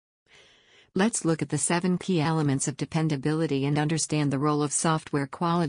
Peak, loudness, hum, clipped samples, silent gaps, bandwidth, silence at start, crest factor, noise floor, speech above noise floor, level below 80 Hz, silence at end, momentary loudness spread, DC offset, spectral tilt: -12 dBFS; -26 LUFS; none; under 0.1%; none; 10.5 kHz; 0.95 s; 14 dB; -59 dBFS; 33 dB; -62 dBFS; 0 s; 4 LU; under 0.1%; -5 dB/octave